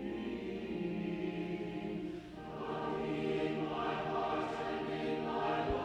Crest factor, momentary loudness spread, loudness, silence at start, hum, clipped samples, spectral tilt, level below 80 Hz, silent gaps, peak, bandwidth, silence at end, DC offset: 14 dB; 6 LU; -38 LUFS; 0 s; none; under 0.1%; -7 dB/octave; -58 dBFS; none; -24 dBFS; 10.5 kHz; 0 s; under 0.1%